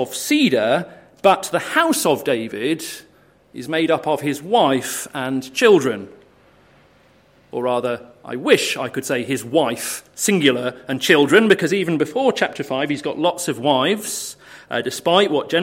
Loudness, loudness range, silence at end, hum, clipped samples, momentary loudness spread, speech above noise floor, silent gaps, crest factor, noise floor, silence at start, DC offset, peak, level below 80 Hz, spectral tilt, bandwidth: -19 LUFS; 4 LU; 0 s; none; under 0.1%; 11 LU; 35 dB; none; 18 dB; -53 dBFS; 0 s; under 0.1%; 0 dBFS; -64 dBFS; -3.5 dB/octave; 16.5 kHz